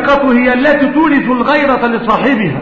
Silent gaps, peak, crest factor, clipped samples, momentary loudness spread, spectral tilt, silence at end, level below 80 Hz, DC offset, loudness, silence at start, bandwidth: none; 0 dBFS; 10 dB; under 0.1%; 3 LU; -7.5 dB/octave; 0 s; -40 dBFS; 0.7%; -10 LUFS; 0 s; 7 kHz